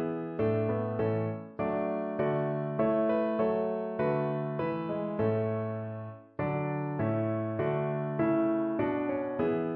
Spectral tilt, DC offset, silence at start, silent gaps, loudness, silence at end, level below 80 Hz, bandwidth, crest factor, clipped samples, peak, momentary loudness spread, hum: -11.5 dB/octave; under 0.1%; 0 s; none; -31 LUFS; 0 s; -64 dBFS; 4.4 kHz; 14 dB; under 0.1%; -16 dBFS; 6 LU; none